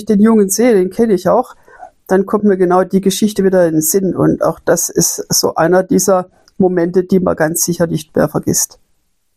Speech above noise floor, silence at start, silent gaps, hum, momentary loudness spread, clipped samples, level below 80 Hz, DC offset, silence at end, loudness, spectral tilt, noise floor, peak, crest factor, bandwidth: 50 dB; 0 s; none; none; 5 LU; under 0.1%; -48 dBFS; under 0.1%; 0.7 s; -13 LUFS; -4.5 dB/octave; -63 dBFS; 0 dBFS; 12 dB; 16 kHz